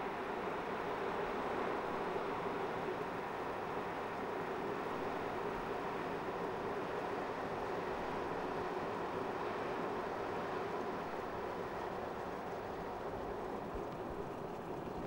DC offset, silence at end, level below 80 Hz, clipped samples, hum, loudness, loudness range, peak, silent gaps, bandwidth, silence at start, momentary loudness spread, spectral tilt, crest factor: under 0.1%; 0 s; -62 dBFS; under 0.1%; none; -41 LUFS; 3 LU; -26 dBFS; none; 16 kHz; 0 s; 4 LU; -6 dB/octave; 14 dB